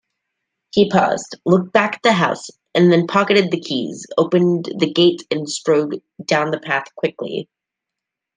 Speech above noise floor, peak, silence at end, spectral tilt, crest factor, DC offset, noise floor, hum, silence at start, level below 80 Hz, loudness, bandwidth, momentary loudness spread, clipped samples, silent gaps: 66 dB; -2 dBFS; 0.95 s; -5.5 dB/octave; 18 dB; under 0.1%; -83 dBFS; none; 0.75 s; -62 dBFS; -18 LUFS; 9.8 kHz; 9 LU; under 0.1%; none